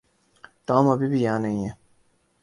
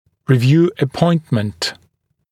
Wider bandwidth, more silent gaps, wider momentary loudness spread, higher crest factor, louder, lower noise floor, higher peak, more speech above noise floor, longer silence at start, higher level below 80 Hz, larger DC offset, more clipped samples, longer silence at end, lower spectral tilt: second, 11 kHz vs 14 kHz; neither; first, 13 LU vs 9 LU; about the same, 20 dB vs 16 dB; second, -23 LUFS vs -16 LUFS; about the same, -64 dBFS vs -61 dBFS; second, -4 dBFS vs 0 dBFS; second, 42 dB vs 46 dB; first, 0.7 s vs 0.3 s; second, -58 dBFS vs -52 dBFS; neither; neither; about the same, 0.7 s vs 0.6 s; about the same, -8 dB/octave vs -7 dB/octave